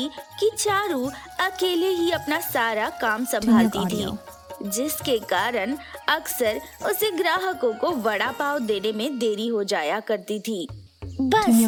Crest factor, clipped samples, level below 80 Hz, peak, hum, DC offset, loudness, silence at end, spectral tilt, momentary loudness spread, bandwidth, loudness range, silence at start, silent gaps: 18 dB; under 0.1%; -56 dBFS; -6 dBFS; none; under 0.1%; -24 LUFS; 0 s; -3.5 dB/octave; 8 LU; 18 kHz; 3 LU; 0 s; none